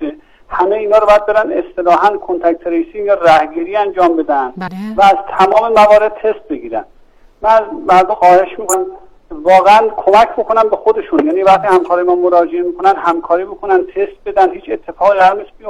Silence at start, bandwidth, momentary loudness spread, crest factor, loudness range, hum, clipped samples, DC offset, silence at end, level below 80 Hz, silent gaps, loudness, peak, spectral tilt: 0 s; 16.5 kHz; 10 LU; 12 dB; 3 LU; none; under 0.1%; 0.2%; 0 s; -44 dBFS; none; -11 LUFS; 0 dBFS; -4.5 dB/octave